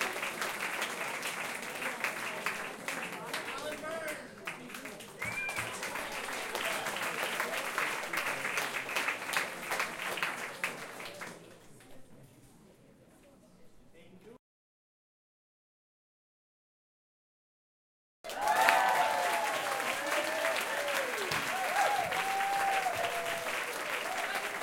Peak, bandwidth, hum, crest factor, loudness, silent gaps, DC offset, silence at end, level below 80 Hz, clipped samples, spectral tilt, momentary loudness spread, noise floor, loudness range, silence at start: -6 dBFS; 17 kHz; none; 30 dB; -33 LUFS; 14.39-18.24 s; under 0.1%; 0 s; -72 dBFS; under 0.1%; -1.5 dB/octave; 10 LU; -60 dBFS; 9 LU; 0 s